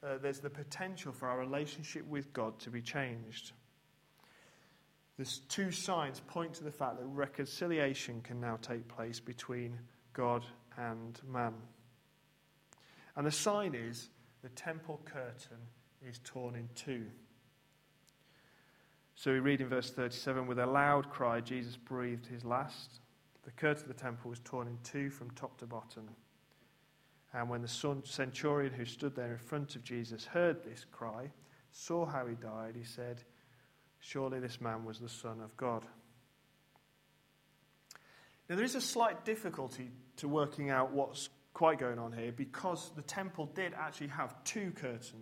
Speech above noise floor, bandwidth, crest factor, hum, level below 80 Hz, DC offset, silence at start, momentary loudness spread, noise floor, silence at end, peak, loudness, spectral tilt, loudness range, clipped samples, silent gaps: 32 dB; 16 kHz; 24 dB; none; -78 dBFS; under 0.1%; 0 s; 15 LU; -71 dBFS; 0 s; -16 dBFS; -39 LUFS; -4.5 dB/octave; 10 LU; under 0.1%; none